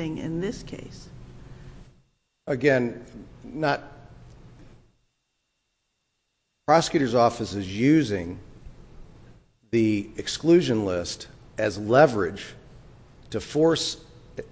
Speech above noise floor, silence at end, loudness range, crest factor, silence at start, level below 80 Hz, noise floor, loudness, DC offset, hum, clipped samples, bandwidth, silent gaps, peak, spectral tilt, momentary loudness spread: 53 dB; 0.05 s; 7 LU; 22 dB; 0 s; -52 dBFS; -76 dBFS; -24 LUFS; under 0.1%; none; under 0.1%; 8 kHz; none; -4 dBFS; -5.5 dB/octave; 21 LU